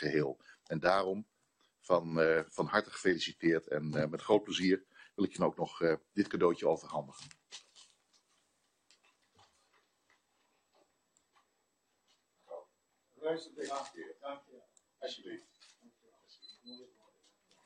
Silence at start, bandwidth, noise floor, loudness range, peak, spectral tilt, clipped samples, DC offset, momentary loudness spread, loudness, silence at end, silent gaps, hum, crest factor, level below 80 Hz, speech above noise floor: 0 s; 10 kHz; -80 dBFS; 17 LU; -12 dBFS; -5.5 dB/octave; under 0.1%; under 0.1%; 21 LU; -34 LUFS; 0.8 s; none; none; 24 dB; -74 dBFS; 46 dB